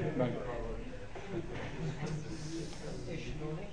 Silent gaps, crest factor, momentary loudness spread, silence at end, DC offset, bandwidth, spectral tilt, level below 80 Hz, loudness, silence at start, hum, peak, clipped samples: none; 20 dB; 8 LU; 0 s; 0.5%; 10.5 kHz; -6.5 dB/octave; -48 dBFS; -41 LUFS; 0 s; none; -20 dBFS; under 0.1%